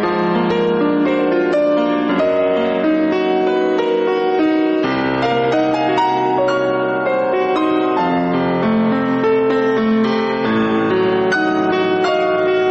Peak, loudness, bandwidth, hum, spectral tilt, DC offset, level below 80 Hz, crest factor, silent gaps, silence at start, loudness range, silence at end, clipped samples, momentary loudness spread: -6 dBFS; -16 LUFS; 8 kHz; none; -7 dB/octave; under 0.1%; -52 dBFS; 10 dB; none; 0 s; 1 LU; 0 s; under 0.1%; 1 LU